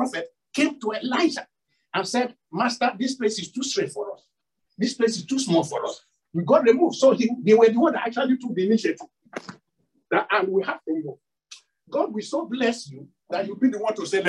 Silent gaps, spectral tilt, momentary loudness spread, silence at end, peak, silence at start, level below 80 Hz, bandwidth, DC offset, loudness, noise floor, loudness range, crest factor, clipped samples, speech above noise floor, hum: none; -4.5 dB/octave; 16 LU; 0 s; -4 dBFS; 0 s; -74 dBFS; 11.5 kHz; under 0.1%; -23 LUFS; -77 dBFS; 7 LU; 20 dB; under 0.1%; 54 dB; none